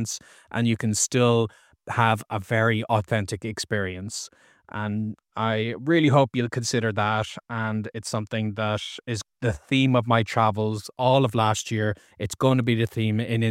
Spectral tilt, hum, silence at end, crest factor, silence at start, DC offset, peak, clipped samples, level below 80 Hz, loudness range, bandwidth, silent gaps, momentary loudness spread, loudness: -5 dB/octave; none; 0 s; 20 dB; 0 s; under 0.1%; -4 dBFS; under 0.1%; -56 dBFS; 4 LU; 15 kHz; none; 11 LU; -24 LUFS